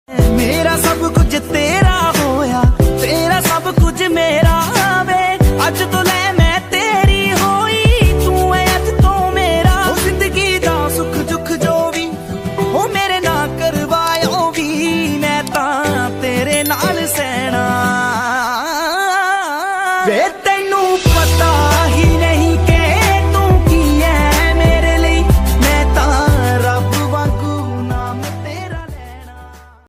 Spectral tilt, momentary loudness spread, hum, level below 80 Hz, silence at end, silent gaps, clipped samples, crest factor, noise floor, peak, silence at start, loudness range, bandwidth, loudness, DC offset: -5 dB/octave; 6 LU; none; -20 dBFS; 0.3 s; none; under 0.1%; 12 dB; -37 dBFS; 0 dBFS; 0.1 s; 4 LU; 16 kHz; -13 LUFS; under 0.1%